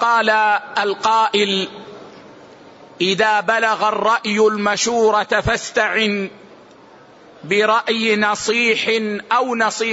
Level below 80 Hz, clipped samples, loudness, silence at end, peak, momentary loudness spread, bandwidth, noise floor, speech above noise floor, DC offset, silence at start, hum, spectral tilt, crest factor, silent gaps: -48 dBFS; under 0.1%; -17 LUFS; 0 s; -4 dBFS; 5 LU; 8 kHz; -45 dBFS; 28 dB; under 0.1%; 0 s; none; -3 dB/octave; 14 dB; none